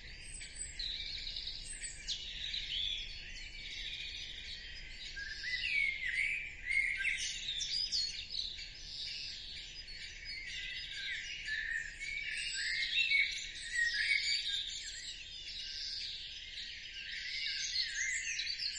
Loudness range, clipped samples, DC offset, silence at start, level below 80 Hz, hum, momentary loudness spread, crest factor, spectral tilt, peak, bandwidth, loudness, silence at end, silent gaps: 7 LU; under 0.1%; under 0.1%; 0 s; -56 dBFS; none; 13 LU; 20 dB; 1.5 dB/octave; -20 dBFS; 11.5 kHz; -37 LUFS; 0 s; none